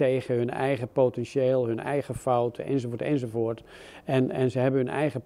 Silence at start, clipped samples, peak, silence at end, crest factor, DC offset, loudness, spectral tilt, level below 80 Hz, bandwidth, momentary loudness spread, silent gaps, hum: 0 s; under 0.1%; -10 dBFS; 0.05 s; 16 dB; under 0.1%; -27 LUFS; -7.5 dB/octave; -60 dBFS; 13 kHz; 5 LU; none; none